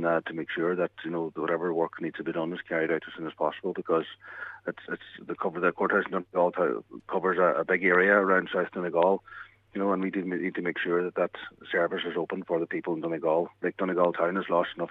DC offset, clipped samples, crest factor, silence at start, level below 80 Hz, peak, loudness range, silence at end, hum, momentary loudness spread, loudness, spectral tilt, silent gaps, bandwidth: under 0.1%; under 0.1%; 20 dB; 0 s; -72 dBFS; -8 dBFS; 6 LU; 0 s; none; 13 LU; -28 LUFS; -8 dB/octave; none; 4.2 kHz